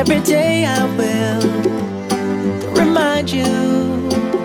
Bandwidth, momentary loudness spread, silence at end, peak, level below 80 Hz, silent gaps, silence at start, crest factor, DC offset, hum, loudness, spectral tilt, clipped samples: 17 kHz; 6 LU; 0 s; -2 dBFS; -48 dBFS; none; 0 s; 14 dB; under 0.1%; none; -16 LUFS; -5 dB/octave; under 0.1%